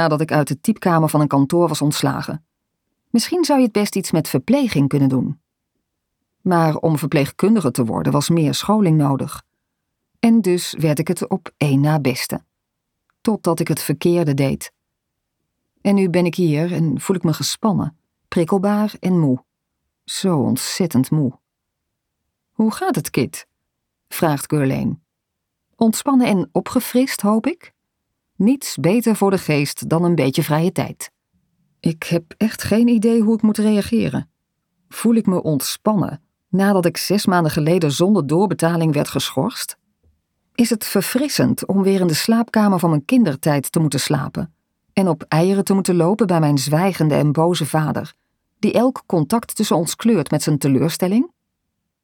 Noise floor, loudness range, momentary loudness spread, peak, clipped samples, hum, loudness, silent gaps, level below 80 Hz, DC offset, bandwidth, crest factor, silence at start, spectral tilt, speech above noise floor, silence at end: -78 dBFS; 4 LU; 9 LU; -2 dBFS; under 0.1%; none; -18 LUFS; none; -56 dBFS; under 0.1%; 18.5 kHz; 16 dB; 0 s; -6 dB/octave; 61 dB; 0.75 s